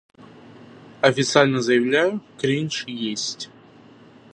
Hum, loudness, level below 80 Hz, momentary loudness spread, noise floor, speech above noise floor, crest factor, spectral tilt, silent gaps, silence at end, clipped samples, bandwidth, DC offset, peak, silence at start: none; -21 LUFS; -68 dBFS; 10 LU; -48 dBFS; 28 dB; 22 dB; -4.5 dB/octave; none; 0.85 s; under 0.1%; 11 kHz; under 0.1%; 0 dBFS; 0.2 s